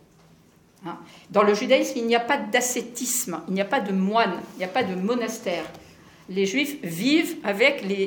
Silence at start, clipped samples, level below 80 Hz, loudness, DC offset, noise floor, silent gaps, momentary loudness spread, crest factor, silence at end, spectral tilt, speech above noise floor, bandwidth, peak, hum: 0.8 s; under 0.1%; -68 dBFS; -23 LUFS; under 0.1%; -56 dBFS; none; 11 LU; 20 dB; 0 s; -3.5 dB/octave; 32 dB; 19 kHz; -4 dBFS; none